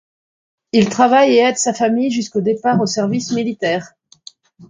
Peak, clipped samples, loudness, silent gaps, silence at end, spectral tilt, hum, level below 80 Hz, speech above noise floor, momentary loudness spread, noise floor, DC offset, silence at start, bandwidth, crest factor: 0 dBFS; under 0.1%; -16 LUFS; none; 0.05 s; -4.5 dB/octave; none; -58 dBFS; 29 dB; 8 LU; -44 dBFS; under 0.1%; 0.75 s; 9.6 kHz; 16 dB